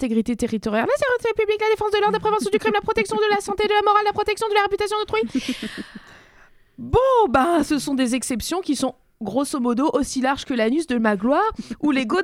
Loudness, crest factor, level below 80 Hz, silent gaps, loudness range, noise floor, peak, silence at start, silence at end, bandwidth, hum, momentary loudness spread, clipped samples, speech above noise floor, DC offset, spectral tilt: -21 LUFS; 16 dB; -46 dBFS; none; 3 LU; -52 dBFS; -4 dBFS; 0 s; 0 s; 15.5 kHz; none; 7 LU; under 0.1%; 31 dB; under 0.1%; -4.5 dB/octave